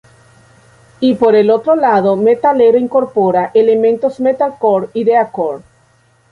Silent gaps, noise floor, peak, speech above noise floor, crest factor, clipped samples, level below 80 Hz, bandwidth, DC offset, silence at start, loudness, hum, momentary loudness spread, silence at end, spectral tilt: none; -52 dBFS; 0 dBFS; 41 dB; 12 dB; under 0.1%; -56 dBFS; 4.8 kHz; under 0.1%; 1 s; -12 LUFS; none; 6 LU; 0.75 s; -8 dB/octave